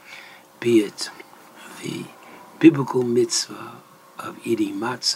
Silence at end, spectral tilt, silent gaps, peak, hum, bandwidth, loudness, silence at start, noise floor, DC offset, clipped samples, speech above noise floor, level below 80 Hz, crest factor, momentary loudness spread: 0 s; -4.5 dB/octave; none; -2 dBFS; none; 16 kHz; -21 LUFS; 0.1 s; -45 dBFS; under 0.1%; under 0.1%; 24 dB; -74 dBFS; 22 dB; 24 LU